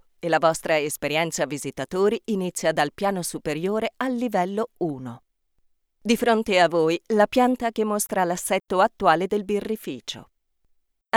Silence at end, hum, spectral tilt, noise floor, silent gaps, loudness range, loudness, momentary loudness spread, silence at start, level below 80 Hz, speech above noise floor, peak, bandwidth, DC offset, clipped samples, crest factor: 0 s; none; -4 dB/octave; -67 dBFS; none; 5 LU; -23 LUFS; 10 LU; 0.25 s; -58 dBFS; 43 dB; -4 dBFS; 19 kHz; under 0.1%; under 0.1%; 20 dB